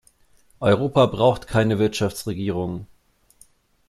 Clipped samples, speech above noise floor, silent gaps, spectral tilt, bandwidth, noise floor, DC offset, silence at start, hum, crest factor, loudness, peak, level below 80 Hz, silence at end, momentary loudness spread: under 0.1%; 37 dB; none; -6.5 dB/octave; 14 kHz; -57 dBFS; under 0.1%; 0.6 s; none; 20 dB; -21 LUFS; -4 dBFS; -50 dBFS; 1.05 s; 10 LU